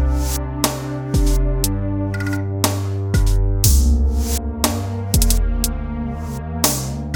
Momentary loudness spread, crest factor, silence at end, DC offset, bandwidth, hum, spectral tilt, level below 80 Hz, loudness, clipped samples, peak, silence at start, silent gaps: 8 LU; 18 dB; 0 s; under 0.1%; 19.5 kHz; none; -4.5 dB/octave; -20 dBFS; -20 LUFS; under 0.1%; 0 dBFS; 0 s; none